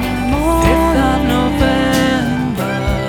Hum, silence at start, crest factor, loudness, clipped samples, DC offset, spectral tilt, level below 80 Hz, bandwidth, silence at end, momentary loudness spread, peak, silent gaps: none; 0 s; 14 dB; -14 LUFS; under 0.1%; under 0.1%; -5.5 dB/octave; -22 dBFS; 20 kHz; 0 s; 5 LU; 0 dBFS; none